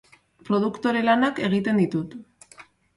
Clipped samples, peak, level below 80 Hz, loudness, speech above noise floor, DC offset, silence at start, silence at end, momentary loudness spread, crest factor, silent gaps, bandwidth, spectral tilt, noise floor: under 0.1%; -8 dBFS; -64 dBFS; -23 LUFS; 29 dB; under 0.1%; 0.5 s; 0.35 s; 11 LU; 16 dB; none; 11.5 kHz; -7 dB/octave; -51 dBFS